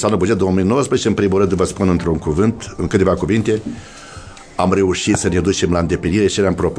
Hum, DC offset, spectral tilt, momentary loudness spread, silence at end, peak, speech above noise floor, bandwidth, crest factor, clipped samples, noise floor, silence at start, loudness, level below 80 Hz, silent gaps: none; under 0.1%; -5.5 dB/octave; 12 LU; 0 s; -2 dBFS; 20 dB; 11 kHz; 16 dB; under 0.1%; -36 dBFS; 0 s; -16 LUFS; -36 dBFS; none